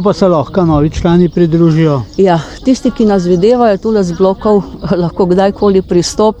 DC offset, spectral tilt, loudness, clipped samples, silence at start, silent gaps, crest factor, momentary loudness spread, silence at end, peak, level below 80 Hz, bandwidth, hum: under 0.1%; -7 dB/octave; -11 LUFS; under 0.1%; 0 s; none; 10 dB; 4 LU; 0.05 s; 0 dBFS; -30 dBFS; 10.5 kHz; none